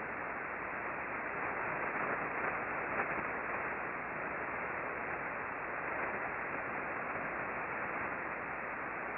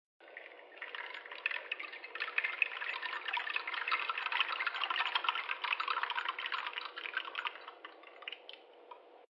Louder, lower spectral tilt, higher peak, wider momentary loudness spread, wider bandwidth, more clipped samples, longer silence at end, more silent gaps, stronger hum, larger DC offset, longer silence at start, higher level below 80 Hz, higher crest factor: about the same, -38 LUFS vs -36 LUFS; first, -5 dB/octave vs 1.5 dB/octave; second, -22 dBFS vs -14 dBFS; second, 4 LU vs 19 LU; second, 5.2 kHz vs 11.5 kHz; neither; about the same, 0 s vs 0.05 s; neither; neither; neither; second, 0 s vs 0.2 s; first, -66 dBFS vs under -90 dBFS; second, 16 dB vs 24 dB